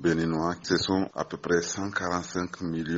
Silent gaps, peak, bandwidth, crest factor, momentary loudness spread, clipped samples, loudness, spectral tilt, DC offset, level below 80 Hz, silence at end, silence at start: none; -10 dBFS; 8 kHz; 18 dB; 7 LU; under 0.1%; -29 LUFS; -4.5 dB/octave; under 0.1%; -56 dBFS; 0 s; 0 s